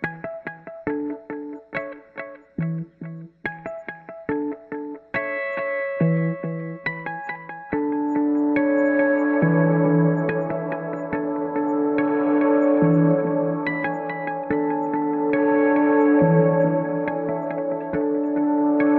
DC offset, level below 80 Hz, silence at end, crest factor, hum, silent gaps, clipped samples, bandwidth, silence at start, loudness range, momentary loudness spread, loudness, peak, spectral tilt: under 0.1%; -60 dBFS; 0 s; 16 dB; none; none; under 0.1%; 4.3 kHz; 0 s; 11 LU; 15 LU; -22 LUFS; -6 dBFS; -11 dB/octave